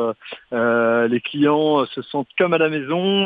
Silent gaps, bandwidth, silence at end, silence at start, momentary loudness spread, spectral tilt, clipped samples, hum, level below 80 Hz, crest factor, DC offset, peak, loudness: none; 4.9 kHz; 0 s; 0 s; 9 LU; -8.5 dB/octave; under 0.1%; none; -68 dBFS; 14 dB; under 0.1%; -4 dBFS; -19 LUFS